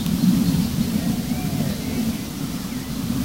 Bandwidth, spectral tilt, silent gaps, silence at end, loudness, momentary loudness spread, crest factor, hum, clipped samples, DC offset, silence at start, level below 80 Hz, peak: 16 kHz; -5.5 dB/octave; none; 0 s; -23 LUFS; 9 LU; 16 dB; none; under 0.1%; 0.3%; 0 s; -38 dBFS; -6 dBFS